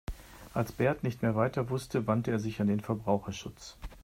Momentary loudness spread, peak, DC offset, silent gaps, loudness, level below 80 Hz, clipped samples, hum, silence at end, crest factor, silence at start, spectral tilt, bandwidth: 15 LU; -14 dBFS; under 0.1%; none; -32 LUFS; -52 dBFS; under 0.1%; none; 0 s; 18 dB; 0.1 s; -7 dB/octave; 16 kHz